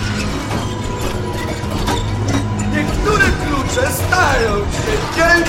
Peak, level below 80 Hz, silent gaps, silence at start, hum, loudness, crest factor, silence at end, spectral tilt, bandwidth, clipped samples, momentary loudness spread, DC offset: 0 dBFS; -26 dBFS; none; 0 s; none; -17 LUFS; 16 dB; 0 s; -4.5 dB/octave; 16.5 kHz; under 0.1%; 8 LU; under 0.1%